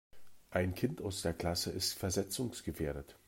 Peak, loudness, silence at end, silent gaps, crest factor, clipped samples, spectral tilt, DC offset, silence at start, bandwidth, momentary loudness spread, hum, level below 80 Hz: -18 dBFS; -37 LUFS; 0.1 s; none; 20 dB; under 0.1%; -4 dB/octave; under 0.1%; 0.15 s; 16 kHz; 6 LU; none; -58 dBFS